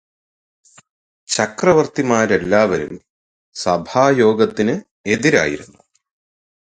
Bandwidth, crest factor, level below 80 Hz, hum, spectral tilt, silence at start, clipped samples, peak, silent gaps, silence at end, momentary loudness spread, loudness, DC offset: 9.6 kHz; 18 dB; -52 dBFS; none; -4.5 dB/octave; 1.3 s; under 0.1%; 0 dBFS; 3.10-3.52 s, 4.91-5.04 s; 1.05 s; 11 LU; -16 LUFS; under 0.1%